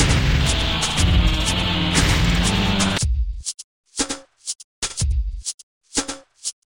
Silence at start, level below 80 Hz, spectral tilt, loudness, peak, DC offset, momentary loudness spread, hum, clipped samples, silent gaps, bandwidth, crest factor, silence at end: 0 s; -24 dBFS; -3.5 dB/octave; -21 LUFS; -4 dBFS; under 0.1%; 13 LU; none; under 0.1%; 3.64-3.84 s, 4.64-4.82 s, 5.54-5.81 s; 16.5 kHz; 16 dB; 0.2 s